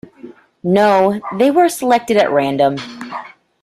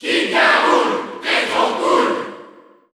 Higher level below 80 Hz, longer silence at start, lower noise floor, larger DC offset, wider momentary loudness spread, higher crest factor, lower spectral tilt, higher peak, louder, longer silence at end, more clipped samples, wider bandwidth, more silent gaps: first, -58 dBFS vs -64 dBFS; first, 0.25 s vs 0 s; second, -39 dBFS vs -44 dBFS; neither; first, 15 LU vs 10 LU; about the same, 14 dB vs 16 dB; first, -5.5 dB/octave vs -2.5 dB/octave; about the same, -2 dBFS vs -2 dBFS; about the same, -14 LUFS vs -16 LUFS; about the same, 0.35 s vs 0.45 s; neither; first, 15.5 kHz vs 13.5 kHz; neither